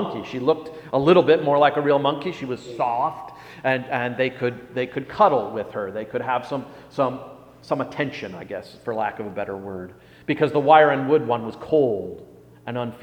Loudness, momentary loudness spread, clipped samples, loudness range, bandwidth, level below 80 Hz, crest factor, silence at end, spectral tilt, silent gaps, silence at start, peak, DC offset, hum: -22 LUFS; 18 LU; under 0.1%; 8 LU; 9.2 kHz; -60 dBFS; 22 dB; 0 s; -7 dB/octave; none; 0 s; 0 dBFS; under 0.1%; none